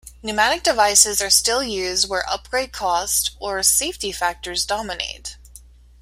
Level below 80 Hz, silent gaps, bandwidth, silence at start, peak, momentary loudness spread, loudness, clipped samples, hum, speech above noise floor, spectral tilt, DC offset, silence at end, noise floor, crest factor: -44 dBFS; none; 16 kHz; 0.05 s; 0 dBFS; 12 LU; -19 LUFS; under 0.1%; none; 25 dB; 0 dB/octave; under 0.1%; 0.45 s; -46 dBFS; 22 dB